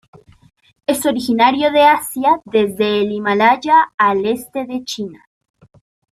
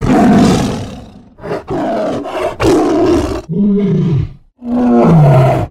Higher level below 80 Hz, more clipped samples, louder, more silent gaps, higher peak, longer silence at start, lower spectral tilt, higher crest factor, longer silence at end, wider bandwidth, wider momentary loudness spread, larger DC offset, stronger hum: second, -56 dBFS vs -30 dBFS; neither; second, -15 LUFS vs -12 LUFS; first, 3.94-3.98 s vs none; about the same, -2 dBFS vs 0 dBFS; first, 0.9 s vs 0 s; second, -4 dB/octave vs -7.5 dB/octave; about the same, 16 dB vs 12 dB; first, 0.95 s vs 0 s; first, 15 kHz vs 13.5 kHz; second, 12 LU vs 16 LU; neither; neither